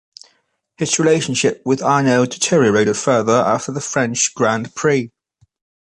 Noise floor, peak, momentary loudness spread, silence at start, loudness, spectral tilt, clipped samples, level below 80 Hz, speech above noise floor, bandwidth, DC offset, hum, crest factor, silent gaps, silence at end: -64 dBFS; -2 dBFS; 6 LU; 0.8 s; -16 LUFS; -4 dB/octave; under 0.1%; -58 dBFS; 47 dB; 11.5 kHz; under 0.1%; none; 16 dB; none; 0.75 s